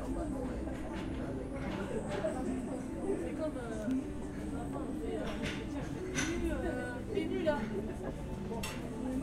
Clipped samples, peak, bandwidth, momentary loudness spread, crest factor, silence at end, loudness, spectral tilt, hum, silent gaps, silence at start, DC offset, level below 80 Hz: under 0.1%; -20 dBFS; 15.5 kHz; 6 LU; 16 dB; 0 s; -38 LUFS; -5.5 dB/octave; none; none; 0 s; under 0.1%; -46 dBFS